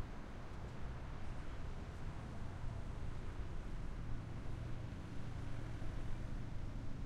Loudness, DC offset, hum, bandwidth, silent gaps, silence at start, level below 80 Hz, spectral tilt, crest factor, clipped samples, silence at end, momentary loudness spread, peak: -49 LUFS; under 0.1%; none; 9.8 kHz; none; 0 s; -48 dBFS; -7 dB/octave; 12 dB; under 0.1%; 0 s; 2 LU; -30 dBFS